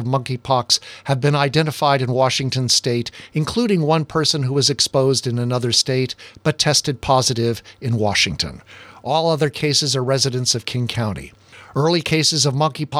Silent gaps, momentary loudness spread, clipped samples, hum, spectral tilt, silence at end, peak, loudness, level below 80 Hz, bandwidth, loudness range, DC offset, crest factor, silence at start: none; 8 LU; under 0.1%; none; -4 dB/octave; 0 s; -2 dBFS; -18 LUFS; -50 dBFS; 15 kHz; 2 LU; under 0.1%; 18 dB; 0 s